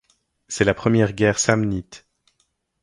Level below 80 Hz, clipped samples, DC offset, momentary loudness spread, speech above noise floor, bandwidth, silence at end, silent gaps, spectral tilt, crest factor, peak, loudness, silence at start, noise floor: -46 dBFS; under 0.1%; under 0.1%; 10 LU; 50 dB; 11.5 kHz; 0.85 s; none; -5 dB/octave; 22 dB; 0 dBFS; -20 LUFS; 0.5 s; -69 dBFS